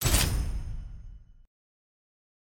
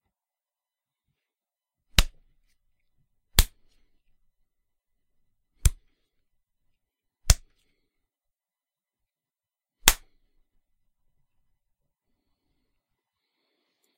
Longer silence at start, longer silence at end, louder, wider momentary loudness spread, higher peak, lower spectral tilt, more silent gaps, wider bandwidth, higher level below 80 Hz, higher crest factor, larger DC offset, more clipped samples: second, 0 s vs 2 s; second, 1.15 s vs 4 s; second, -30 LUFS vs -25 LUFS; first, 24 LU vs 14 LU; second, -10 dBFS vs 0 dBFS; about the same, -3 dB/octave vs -2 dB/octave; neither; about the same, 17 kHz vs 16 kHz; about the same, -34 dBFS vs -34 dBFS; second, 22 dB vs 32 dB; neither; neither